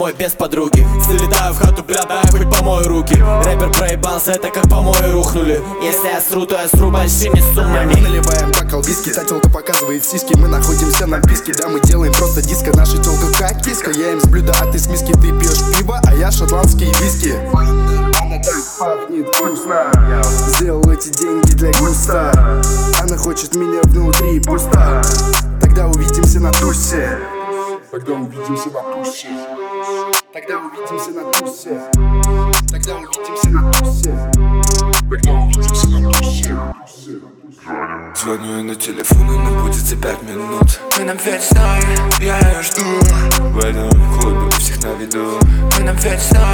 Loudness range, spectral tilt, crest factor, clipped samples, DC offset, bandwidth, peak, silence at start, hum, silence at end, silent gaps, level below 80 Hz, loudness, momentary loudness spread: 5 LU; -4.5 dB/octave; 12 dB; under 0.1%; under 0.1%; over 20 kHz; 0 dBFS; 0 s; none; 0 s; none; -14 dBFS; -14 LUFS; 10 LU